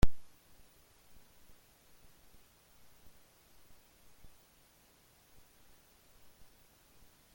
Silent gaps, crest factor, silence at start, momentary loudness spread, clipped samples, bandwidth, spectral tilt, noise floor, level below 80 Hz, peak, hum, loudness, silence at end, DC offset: none; 26 dB; 0.05 s; 1 LU; under 0.1%; 17 kHz; -6 dB/octave; -66 dBFS; -48 dBFS; -12 dBFS; none; -56 LUFS; 7.15 s; under 0.1%